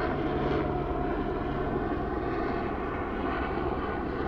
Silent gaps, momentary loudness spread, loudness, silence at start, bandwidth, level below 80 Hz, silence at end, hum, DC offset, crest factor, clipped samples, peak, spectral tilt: none; 3 LU; -31 LUFS; 0 s; 6.6 kHz; -40 dBFS; 0 s; none; under 0.1%; 12 dB; under 0.1%; -18 dBFS; -9 dB/octave